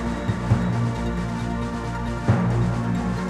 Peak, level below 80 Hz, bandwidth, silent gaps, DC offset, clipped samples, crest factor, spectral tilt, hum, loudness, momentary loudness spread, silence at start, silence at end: -6 dBFS; -34 dBFS; 11 kHz; none; under 0.1%; under 0.1%; 16 dB; -7.5 dB/octave; none; -24 LUFS; 6 LU; 0 s; 0 s